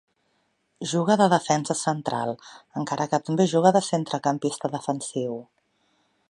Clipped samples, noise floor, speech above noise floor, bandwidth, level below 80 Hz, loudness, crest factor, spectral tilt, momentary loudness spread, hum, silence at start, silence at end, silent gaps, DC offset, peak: under 0.1%; -70 dBFS; 47 dB; 11.5 kHz; -72 dBFS; -24 LUFS; 22 dB; -5 dB/octave; 13 LU; none; 0.8 s; 0.85 s; none; under 0.1%; -4 dBFS